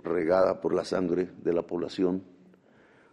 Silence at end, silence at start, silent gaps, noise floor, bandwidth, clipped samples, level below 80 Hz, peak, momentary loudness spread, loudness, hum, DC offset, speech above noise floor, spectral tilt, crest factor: 0.9 s; 0.05 s; none; -59 dBFS; 10.5 kHz; under 0.1%; -64 dBFS; -10 dBFS; 6 LU; -28 LUFS; none; under 0.1%; 32 dB; -7 dB/octave; 18 dB